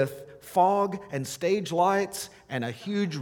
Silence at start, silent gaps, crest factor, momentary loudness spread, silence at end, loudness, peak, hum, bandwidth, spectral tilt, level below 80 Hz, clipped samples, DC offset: 0 s; none; 18 dB; 11 LU; 0 s; -27 LUFS; -10 dBFS; none; 19 kHz; -5 dB/octave; -68 dBFS; under 0.1%; under 0.1%